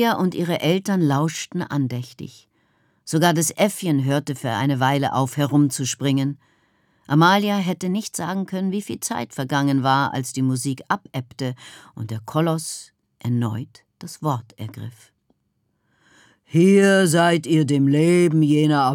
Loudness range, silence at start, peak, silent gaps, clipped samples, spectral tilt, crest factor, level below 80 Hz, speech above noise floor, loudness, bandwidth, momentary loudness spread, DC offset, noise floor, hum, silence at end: 8 LU; 0 s; -4 dBFS; none; under 0.1%; -5.5 dB/octave; 16 dB; -70 dBFS; 50 dB; -20 LUFS; 18.5 kHz; 17 LU; under 0.1%; -70 dBFS; none; 0 s